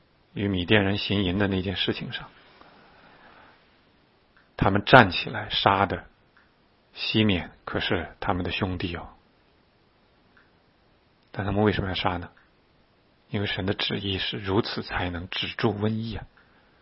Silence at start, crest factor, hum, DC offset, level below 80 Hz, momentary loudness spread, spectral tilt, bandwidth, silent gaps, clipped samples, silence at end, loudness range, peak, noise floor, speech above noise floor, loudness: 0.35 s; 28 dB; none; under 0.1%; -48 dBFS; 14 LU; -8 dB/octave; 5.8 kHz; none; under 0.1%; 0.55 s; 9 LU; 0 dBFS; -62 dBFS; 37 dB; -25 LUFS